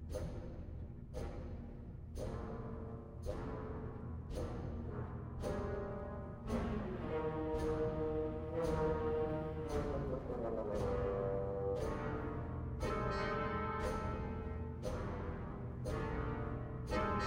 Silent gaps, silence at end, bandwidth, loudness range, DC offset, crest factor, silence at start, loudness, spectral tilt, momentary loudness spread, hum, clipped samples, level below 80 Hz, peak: none; 0 s; 16.5 kHz; 7 LU; under 0.1%; 16 dB; 0 s; -42 LUFS; -7.5 dB/octave; 9 LU; none; under 0.1%; -48 dBFS; -24 dBFS